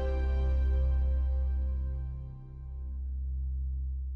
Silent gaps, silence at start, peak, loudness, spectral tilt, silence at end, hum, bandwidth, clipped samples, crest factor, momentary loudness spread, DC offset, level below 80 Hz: none; 0 s; -22 dBFS; -33 LUFS; -9.5 dB/octave; 0 s; none; 4.1 kHz; under 0.1%; 10 dB; 13 LU; under 0.1%; -30 dBFS